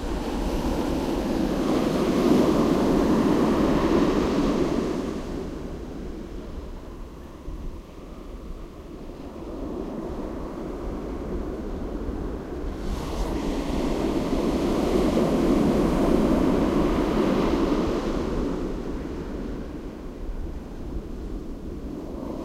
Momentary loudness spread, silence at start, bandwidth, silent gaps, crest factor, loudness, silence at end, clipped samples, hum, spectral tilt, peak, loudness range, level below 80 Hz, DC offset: 18 LU; 0 s; 16 kHz; none; 18 dB; -25 LUFS; 0 s; under 0.1%; none; -7 dB/octave; -6 dBFS; 15 LU; -34 dBFS; under 0.1%